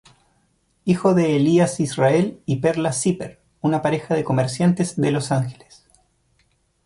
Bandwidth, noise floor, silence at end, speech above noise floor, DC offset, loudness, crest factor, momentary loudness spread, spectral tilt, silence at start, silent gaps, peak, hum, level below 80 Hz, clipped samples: 11.5 kHz; -64 dBFS; 1.3 s; 45 dB; under 0.1%; -20 LUFS; 16 dB; 7 LU; -6 dB/octave; 0.85 s; none; -4 dBFS; none; -56 dBFS; under 0.1%